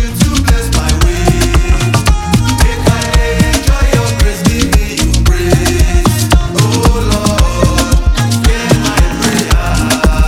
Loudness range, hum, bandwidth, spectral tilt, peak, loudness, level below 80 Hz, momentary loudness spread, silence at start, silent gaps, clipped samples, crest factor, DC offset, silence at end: 0 LU; none; 16.5 kHz; -5 dB/octave; 0 dBFS; -11 LUFS; -12 dBFS; 2 LU; 0 s; none; 0.3%; 10 dB; under 0.1%; 0 s